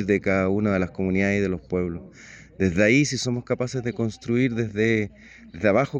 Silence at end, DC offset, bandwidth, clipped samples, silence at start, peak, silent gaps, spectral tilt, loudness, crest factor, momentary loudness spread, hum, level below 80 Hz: 0 s; under 0.1%; 9.6 kHz; under 0.1%; 0 s; -6 dBFS; none; -6 dB/octave; -23 LUFS; 18 dB; 9 LU; none; -52 dBFS